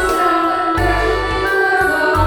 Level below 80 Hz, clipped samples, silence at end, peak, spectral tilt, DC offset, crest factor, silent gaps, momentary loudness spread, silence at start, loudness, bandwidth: -28 dBFS; under 0.1%; 0 s; -2 dBFS; -5 dB/octave; under 0.1%; 12 dB; none; 3 LU; 0 s; -15 LUFS; 18 kHz